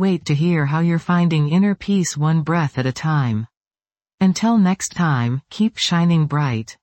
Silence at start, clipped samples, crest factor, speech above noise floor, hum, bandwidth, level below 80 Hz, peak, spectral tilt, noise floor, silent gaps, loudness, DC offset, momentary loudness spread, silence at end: 0 s; under 0.1%; 12 dB; over 72 dB; none; 8.6 kHz; -54 dBFS; -6 dBFS; -6 dB/octave; under -90 dBFS; 3.57-3.61 s, 4.14-4.18 s; -18 LUFS; under 0.1%; 6 LU; 0.1 s